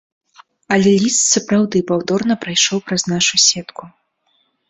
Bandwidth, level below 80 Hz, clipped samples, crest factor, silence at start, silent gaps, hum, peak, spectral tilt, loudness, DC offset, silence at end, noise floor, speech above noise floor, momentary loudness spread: 8.4 kHz; -56 dBFS; under 0.1%; 16 dB; 0.7 s; none; none; -2 dBFS; -3 dB/octave; -15 LUFS; under 0.1%; 0.8 s; -63 dBFS; 48 dB; 7 LU